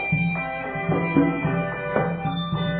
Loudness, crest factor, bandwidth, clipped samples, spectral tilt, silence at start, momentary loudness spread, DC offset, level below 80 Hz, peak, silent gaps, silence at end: -24 LUFS; 18 dB; 4.4 kHz; under 0.1%; -11.5 dB/octave; 0 s; 6 LU; under 0.1%; -46 dBFS; -6 dBFS; none; 0 s